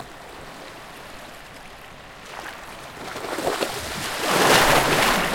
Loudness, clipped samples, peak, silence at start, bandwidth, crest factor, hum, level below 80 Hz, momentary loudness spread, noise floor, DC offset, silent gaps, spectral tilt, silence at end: -20 LUFS; under 0.1%; -4 dBFS; 0 s; 17 kHz; 22 dB; none; -44 dBFS; 25 LU; -42 dBFS; under 0.1%; none; -2.5 dB/octave; 0 s